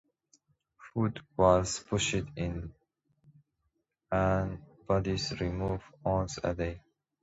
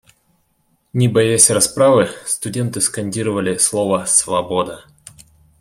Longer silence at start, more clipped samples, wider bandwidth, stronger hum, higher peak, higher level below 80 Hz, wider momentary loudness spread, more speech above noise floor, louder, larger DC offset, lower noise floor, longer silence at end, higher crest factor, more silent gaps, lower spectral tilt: second, 0.8 s vs 0.95 s; neither; second, 8 kHz vs 16.5 kHz; neither; second, -10 dBFS vs 0 dBFS; first, -48 dBFS vs -54 dBFS; about the same, 12 LU vs 11 LU; about the same, 49 dB vs 47 dB; second, -31 LUFS vs -15 LUFS; neither; first, -80 dBFS vs -63 dBFS; second, 0.45 s vs 0.8 s; about the same, 22 dB vs 18 dB; neither; first, -5.5 dB/octave vs -3.5 dB/octave